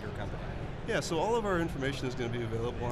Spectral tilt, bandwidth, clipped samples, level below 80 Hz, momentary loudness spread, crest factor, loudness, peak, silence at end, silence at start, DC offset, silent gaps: -5.5 dB/octave; 13.5 kHz; under 0.1%; -46 dBFS; 9 LU; 16 dB; -34 LUFS; -16 dBFS; 0 s; 0 s; under 0.1%; none